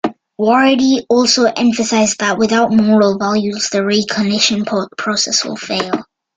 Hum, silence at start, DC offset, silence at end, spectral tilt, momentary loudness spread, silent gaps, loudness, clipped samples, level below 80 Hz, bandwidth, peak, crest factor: none; 0.05 s; under 0.1%; 0.35 s; -3.5 dB/octave; 8 LU; none; -14 LUFS; under 0.1%; -54 dBFS; 9.4 kHz; 0 dBFS; 14 dB